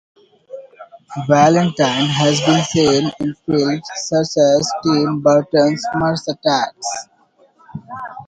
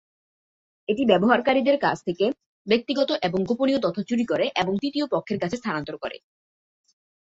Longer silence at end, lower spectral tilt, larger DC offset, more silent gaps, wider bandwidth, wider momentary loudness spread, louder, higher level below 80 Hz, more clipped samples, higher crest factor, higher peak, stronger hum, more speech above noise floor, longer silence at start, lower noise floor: second, 0.05 s vs 1.1 s; about the same, -5 dB/octave vs -6 dB/octave; neither; second, none vs 2.46-2.65 s; first, 9.4 kHz vs 7.8 kHz; first, 18 LU vs 11 LU; first, -16 LUFS vs -24 LUFS; first, -52 dBFS vs -62 dBFS; neither; about the same, 16 dB vs 20 dB; first, 0 dBFS vs -4 dBFS; neither; second, 38 dB vs over 67 dB; second, 0.5 s vs 0.9 s; second, -54 dBFS vs under -90 dBFS